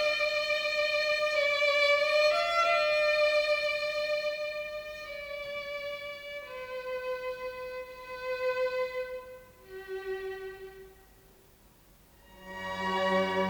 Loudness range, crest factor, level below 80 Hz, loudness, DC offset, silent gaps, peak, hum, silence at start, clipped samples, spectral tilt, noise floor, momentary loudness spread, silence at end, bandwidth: 15 LU; 16 dB; -64 dBFS; -30 LUFS; under 0.1%; none; -16 dBFS; none; 0 s; under 0.1%; -3 dB/octave; -59 dBFS; 16 LU; 0 s; over 20 kHz